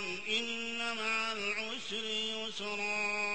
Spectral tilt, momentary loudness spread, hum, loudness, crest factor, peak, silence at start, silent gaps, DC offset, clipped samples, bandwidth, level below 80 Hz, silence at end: -1.5 dB/octave; 5 LU; none; -34 LUFS; 14 dB; -22 dBFS; 0 s; none; 0.4%; under 0.1%; 8.4 kHz; -74 dBFS; 0 s